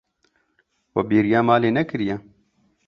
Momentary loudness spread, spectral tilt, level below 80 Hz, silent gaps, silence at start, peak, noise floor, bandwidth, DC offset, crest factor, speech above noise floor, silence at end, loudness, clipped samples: 11 LU; -8.5 dB/octave; -56 dBFS; none; 0.95 s; -4 dBFS; -68 dBFS; 6.2 kHz; under 0.1%; 20 dB; 48 dB; 0.7 s; -20 LUFS; under 0.1%